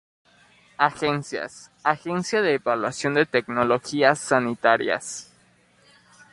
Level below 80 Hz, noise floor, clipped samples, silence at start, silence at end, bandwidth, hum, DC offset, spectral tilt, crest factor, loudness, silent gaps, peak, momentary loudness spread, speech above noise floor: -64 dBFS; -59 dBFS; under 0.1%; 0.8 s; 1.1 s; 11.5 kHz; 60 Hz at -55 dBFS; under 0.1%; -4.5 dB/octave; 22 dB; -23 LUFS; none; -2 dBFS; 9 LU; 36 dB